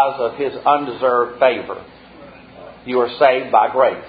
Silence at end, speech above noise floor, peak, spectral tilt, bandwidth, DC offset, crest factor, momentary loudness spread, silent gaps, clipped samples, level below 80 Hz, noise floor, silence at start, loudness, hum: 0 s; 24 dB; 0 dBFS; -8.5 dB/octave; 5 kHz; under 0.1%; 18 dB; 12 LU; none; under 0.1%; -56 dBFS; -41 dBFS; 0 s; -17 LUFS; none